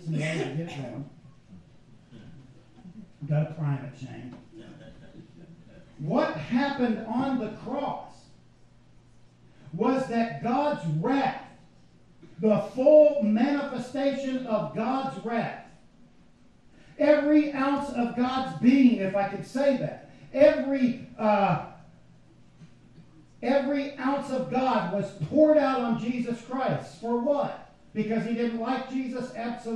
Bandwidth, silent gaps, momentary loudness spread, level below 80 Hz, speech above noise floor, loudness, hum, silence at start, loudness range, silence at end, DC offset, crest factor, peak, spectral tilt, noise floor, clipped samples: 10.5 kHz; none; 16 LU; -62 dBFS; 32 dB; -26 LUFS; none; 0 s; 11 LU; 0 s; 0.1%; 20 dB; -6 dBFS; -7.5 dB/octave; -58 dBFS; under 0.1%